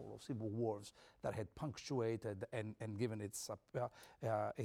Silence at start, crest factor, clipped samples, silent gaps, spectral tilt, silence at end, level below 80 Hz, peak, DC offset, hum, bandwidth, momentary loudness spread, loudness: 0 s; 16 dB; under 0.1%; none; -6 dB/octave; 0 s; -74 dBFS; -28 dBFS; under 0.1%; none; 17 kHz; 7 LU; -45 LUFS